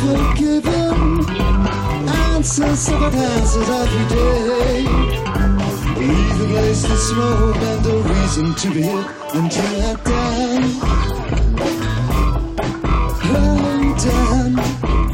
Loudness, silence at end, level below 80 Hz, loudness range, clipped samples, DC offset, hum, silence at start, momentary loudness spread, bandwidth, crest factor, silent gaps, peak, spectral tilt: -17 LUFS; 0 s; -20 dBFS; 2 LU; under 0.1%; under 0.1%; none; 0 s; 4 LU; 16 kHz; 12 dB; none; -4 dBFS; -5.5 dB/octave